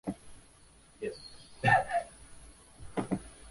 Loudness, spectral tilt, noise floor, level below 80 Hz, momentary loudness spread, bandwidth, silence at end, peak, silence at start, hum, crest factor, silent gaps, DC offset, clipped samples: -32 LUFS; -5.5 dB/octave; -59 dBFS; -58 dBFS; 27 LU; 11.5 kHz; 0 s; -12 dBFS; 0.05 s; none; 24 dB; none; under 0.1%; under 0.1%